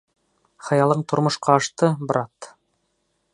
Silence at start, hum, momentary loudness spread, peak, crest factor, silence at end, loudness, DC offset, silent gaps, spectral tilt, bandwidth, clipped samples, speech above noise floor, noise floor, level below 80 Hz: 0.65 s; none; 20 LU; -2 dBFS; 22 dB; 0.9 s; -21 LUFS; under 0.1%; none; -5.5 dB/octave; 11 kHz; under 0.1%; 51 dB; -71 dBFS; -68 dBFS